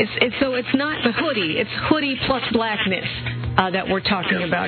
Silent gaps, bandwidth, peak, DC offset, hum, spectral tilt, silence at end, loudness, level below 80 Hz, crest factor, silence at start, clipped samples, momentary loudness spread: none; 4.6 kHz; 0 dBFS; under 0.1%; none; -3 dB/octave; 0 s; -21 LUFS; -44 dBFS; 20 dB; 0 s; under 0.1%; 2 LU